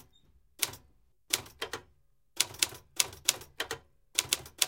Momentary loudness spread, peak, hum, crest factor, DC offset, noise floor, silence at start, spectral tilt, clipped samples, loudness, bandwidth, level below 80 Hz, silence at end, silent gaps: 13 LU; -2 dBFS; none; 34 dB; under 0.1%; -70 dBFS; 0.6 s; 0.5 dB/octave; under 0.1%; -32 LUFS; 17 kHz; -64 dBFS; 0 s; none